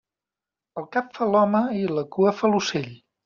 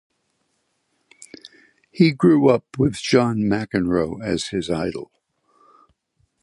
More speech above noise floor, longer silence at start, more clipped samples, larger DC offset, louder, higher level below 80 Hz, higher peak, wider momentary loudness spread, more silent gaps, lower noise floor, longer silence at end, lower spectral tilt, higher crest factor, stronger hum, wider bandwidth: first, 67 dB vs 51 dB; second, 0.75 s vs 1.45 s; neither; neither; second, -23 LUFS vs -20 LUFS; second, -66 dBFS vs -50 dBFS; second, -8 dBFS vs -2 dBFS; about the same, 15 LU vs 17 LU; neither; first, -89 dBFS vs -70 dBFS; second, 0.3 s vs 1.4 s; second, -4.5 dB/octave vs -6.5 dB/octave; about the same, 16 dB vs 20 dB; neither; second, 7.2 kHz vs 11.5 kHz